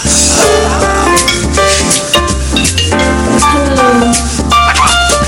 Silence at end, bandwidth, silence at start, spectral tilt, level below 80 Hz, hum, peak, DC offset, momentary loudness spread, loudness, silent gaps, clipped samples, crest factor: 0 s; 17 kHz; 0 s; -3 dB/octave; -18 dBFS; none; 0 dBFS; under 0.1%; 4 LU; -8 LUFS; none; under 0.1%; 10 dB